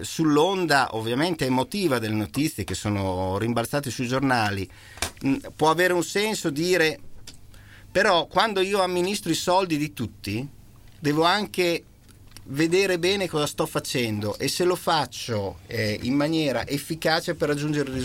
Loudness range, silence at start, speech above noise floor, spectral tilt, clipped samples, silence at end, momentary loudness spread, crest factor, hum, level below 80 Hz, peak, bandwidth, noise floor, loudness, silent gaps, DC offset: 2 LU; 0 s; 23 dB; -4.5 dB/octave; under 0.1%; 0 s; 9 LU; 20 dB; none; -52 dBFS; -4 dBFS; 17 kHz; -47 dBFS; -24 LUFS; none; under 0.1%